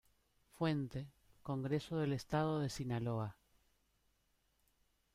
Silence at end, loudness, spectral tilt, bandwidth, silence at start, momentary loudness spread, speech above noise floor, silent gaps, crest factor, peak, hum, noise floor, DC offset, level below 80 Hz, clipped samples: 1.85 s; -40 LUFS; -7 dB/octave; 15 kHz; 0.55 s; 10 LU; 40 dB; none; 18 dB; -24 dBFS; none; -79 dBFS; under 0.1%; -66 dBFS; under 0.1%